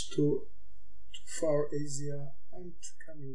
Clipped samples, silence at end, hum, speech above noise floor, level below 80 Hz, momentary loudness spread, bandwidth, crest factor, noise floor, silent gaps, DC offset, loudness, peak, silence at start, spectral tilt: under 0.1%; 0 s; none; 25 dB; -62 dBFS; 19 LU; 10.5 kHz; 18 dB; -59 dBFS; none; 3%; -34 LUFS; -18 dBFS; 0 s; -5.5 dB/octave